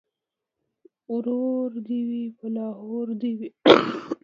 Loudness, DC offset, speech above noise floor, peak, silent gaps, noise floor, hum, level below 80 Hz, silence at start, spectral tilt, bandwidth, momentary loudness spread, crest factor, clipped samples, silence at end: -24 LUFS; under 0.1%; 62 dB; 0 dBFS; none; -86 dBFS; none; -70 dBFS; 1.1 s; -6 dB/octave; 7.2 kHz; 15 LU; 26 dB; under 0.1%; 0.1 s